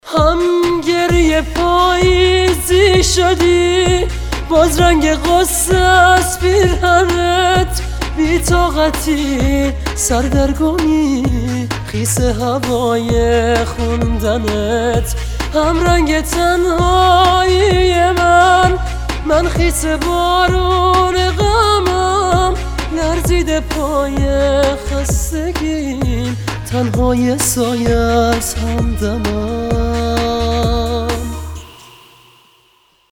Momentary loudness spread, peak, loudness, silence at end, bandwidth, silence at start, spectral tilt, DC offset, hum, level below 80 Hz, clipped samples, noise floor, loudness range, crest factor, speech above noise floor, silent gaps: 8 LU; 0 dBFS; -14 LUFS; 1.4 s; 19 kHz; 0.05 s; -4.5 dB/octave; under 0.1%; none; -22 dBFS; under 0.1%; -54 dBFS; 5 LU; 14 dB; 41 dB; none